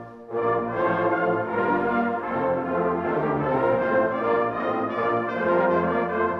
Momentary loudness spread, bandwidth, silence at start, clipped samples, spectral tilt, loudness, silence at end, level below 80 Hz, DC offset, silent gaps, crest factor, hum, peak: 3 LU; 6 kHz; 0 s; under 0.1%; -9 dB/octave; -24 LUFS; 0 s; -56 dBFS; under 0.1%; none; 14 dB; none; -10 dBFS